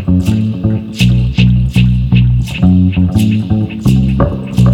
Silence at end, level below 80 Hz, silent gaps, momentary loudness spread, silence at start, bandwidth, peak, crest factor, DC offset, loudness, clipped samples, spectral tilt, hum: 0 s; -20 dBFS; none; 4 LU; 0 s; 13 kHz; 0 dBFS; 10 dB; under 0.1%; -12 LUFS; under 0.1%; -7.5 dB/octave; none